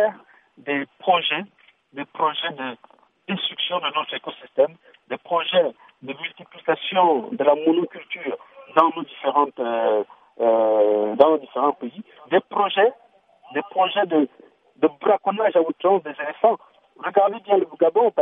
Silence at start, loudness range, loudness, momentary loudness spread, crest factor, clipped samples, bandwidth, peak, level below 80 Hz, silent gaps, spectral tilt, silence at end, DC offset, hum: 0 s; 5 LU; -21 LUFS; 14 LU; 22 dB; under 0.1%; 3.9 kHz; 0 dBFS; -78 dBFS; none; -7.5 dB/octave; 0 s; under 0.1%; none